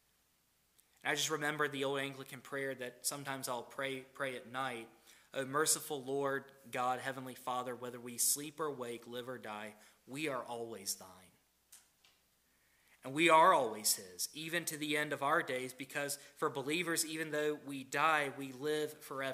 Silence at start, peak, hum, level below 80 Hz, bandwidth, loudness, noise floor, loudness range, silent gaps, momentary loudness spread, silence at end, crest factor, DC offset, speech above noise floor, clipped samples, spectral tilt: 1.05 s; -14 dBFS; none; -86 dBFS; 16 kHz; -36 LUFS; -75 dBFS; 11 LU; none; 13 LU; 0 s; 24 dB; under 0.1%; 38 dB; under 0.1%; -2.5 dB/octave